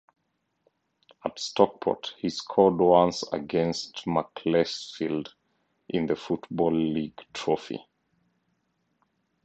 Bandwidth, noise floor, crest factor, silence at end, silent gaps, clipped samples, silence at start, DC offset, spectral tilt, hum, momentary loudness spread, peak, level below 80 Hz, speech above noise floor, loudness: 8.8 kHz; -77 dBFS; 24 dB; 1.65 s; none; under 0.1%; 1.25 s; under 0.1%; -5.5 dB/octave; none; 13 LU; -4 dBFS; -62 dBFS; 51 dB; -27 LUFS